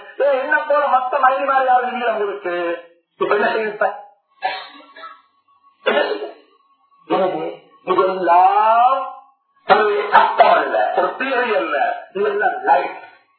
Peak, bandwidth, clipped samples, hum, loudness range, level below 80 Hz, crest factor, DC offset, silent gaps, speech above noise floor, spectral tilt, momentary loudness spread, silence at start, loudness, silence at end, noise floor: 0 dBFS; 4.5 kHz; under 0.1%; none; 9 LU; -78 dBFS; 18 dB; under 0.1%; none; 40 dB; -7.5 dB/octave; 17 LU; 0 s; -17 LUFS; 0.3 s; -57 dBFS